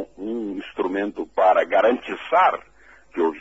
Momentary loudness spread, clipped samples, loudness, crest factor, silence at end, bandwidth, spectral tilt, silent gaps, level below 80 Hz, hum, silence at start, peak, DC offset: 12 LU; under 0.1%; -21 LUFS; 16 dB; 0 s; 8 kHz; -5.5 dB/octave; none; -60 dBFS; none; 0 s; -6 dBFS; 0.2%